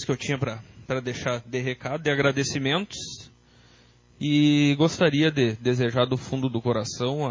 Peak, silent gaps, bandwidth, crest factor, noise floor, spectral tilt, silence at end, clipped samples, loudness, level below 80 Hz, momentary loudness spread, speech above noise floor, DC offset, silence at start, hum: -8 dBFS; none; 7.6 kHz; 18 dB; -56 dBFS; -5.5 dB/octave; 0 s; under 0.1%; -25 LUFS; -56 dBFS; 12 LU; 32 dB; under 0.1%; 0 s; none